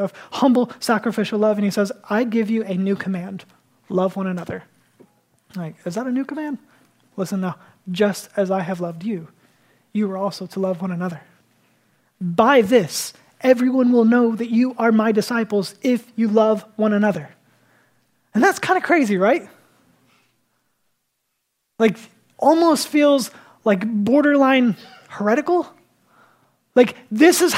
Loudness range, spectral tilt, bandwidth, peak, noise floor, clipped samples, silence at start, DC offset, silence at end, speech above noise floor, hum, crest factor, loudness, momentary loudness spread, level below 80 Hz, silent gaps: 9 LU; -5.5 dB/octave; 16 kHz; 0 dBFS; -74 dBFS; under 0.1%; 0 s; under 0.1%; 0 s; 55 dB; none; 20 dB; -19 LUFS; 15 LU; -72 dBFS; none